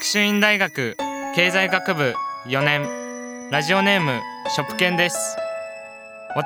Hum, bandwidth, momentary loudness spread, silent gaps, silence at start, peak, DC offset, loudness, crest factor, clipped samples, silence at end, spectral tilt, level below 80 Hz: none; over 20 kHz; 15 LU; none; 0 s; -2 dBFS; under 0.1%; -20 LUFS; 20 dB; under 0.1%; 0 s; -3.5 dB/octave; -68 dBFS